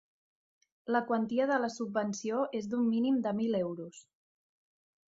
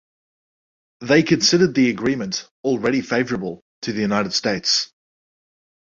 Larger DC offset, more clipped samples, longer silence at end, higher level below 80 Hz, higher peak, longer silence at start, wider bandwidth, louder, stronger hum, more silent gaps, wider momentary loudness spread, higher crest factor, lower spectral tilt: neither; neither; about the same, 1.1 s vs 1 s; second, -78 dBFS vs -58 dBFS; second, -16 dBFS vs -2 dBFS; second, 0.85 s vs 1 s; about the same, 7.8 kHz vs 7.8 kHz; second, -32 LUFS vs -19 LUFS; neither; second, none vs 2.51-2.64 s, 3.62-3.82 s; second, 7 LU vs 12 LU; about the same, 18 dB vs 18 dB; first, -5.5 dB/octave vs -4 dB/octave